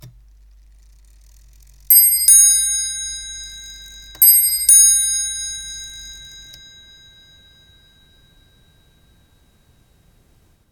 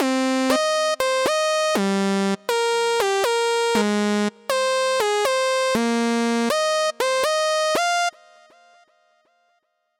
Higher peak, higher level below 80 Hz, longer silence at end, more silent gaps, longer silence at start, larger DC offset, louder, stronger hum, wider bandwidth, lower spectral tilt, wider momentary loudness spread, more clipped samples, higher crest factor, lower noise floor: first, 0 dBFS vs -6 dBFS; first, -48 dBFS vs -64 dBFS; first, 4.45 s vs 1.9 s; neither; about the same, 0.05 s vs 0 s; neither; first, -11 LUFS vs -21 LUFS; neither; first, 19 kHz vs 17 kHz; second, 3 dB/octave vs -3.5 dB/octave; first, 26 LU vs 2 LU; neither; about the same, 20 dB vs 16 dB; second, -55 dBFS vs -69 dBFS